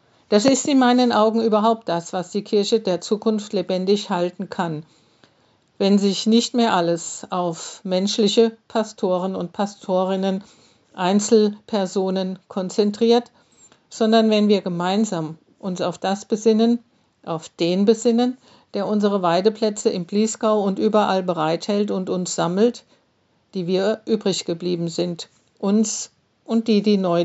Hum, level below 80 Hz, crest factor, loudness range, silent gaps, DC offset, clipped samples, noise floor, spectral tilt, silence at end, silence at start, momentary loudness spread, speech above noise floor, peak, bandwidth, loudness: none; -74 dBFS; 20 dB; 3 LU; none; under 0.1%; under 0.1%; -64 dBFS; -5 dB/octave; 0 s; 0.3 s; 11 LU; 44 dB; -2 dBFS; 8.2 kHz; -20 LUFS